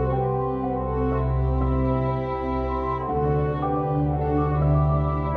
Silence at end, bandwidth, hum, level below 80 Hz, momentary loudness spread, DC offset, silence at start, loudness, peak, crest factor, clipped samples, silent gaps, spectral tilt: 0 s; 4.6 kHz; none; -30 dBFS; 5 LU; under 0.1%; 0 s; -24 LUFS; -10 dBFS; 14 dB; under 0.1%; none; -11 dB/octave